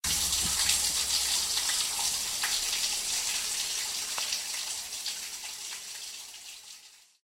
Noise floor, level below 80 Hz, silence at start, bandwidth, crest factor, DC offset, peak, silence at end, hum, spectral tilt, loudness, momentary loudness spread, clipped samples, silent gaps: -54 dBFS; -56 dBFS; 0.05 s; 16 kHz; 22 dB; under 0.1%; -10 dBFS; 0.25 s; none; 1.5 dB/octave; -28 LUFS; 15 LU; under 0.1%; none